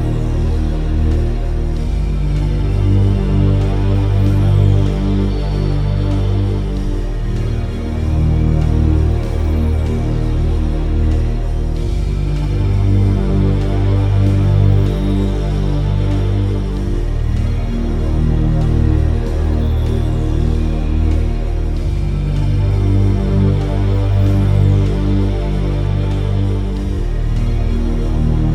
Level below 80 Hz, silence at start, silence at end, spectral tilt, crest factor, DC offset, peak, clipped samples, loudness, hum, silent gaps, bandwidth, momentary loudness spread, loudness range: -18 dBFS; 0 s; 0 s; -8.5 dB/octave; 12 dB; under 0.1%; -2 dBFS; under 0.1%; -17 LUFS; none; none; 9 kHz; 6 LU; 3 LU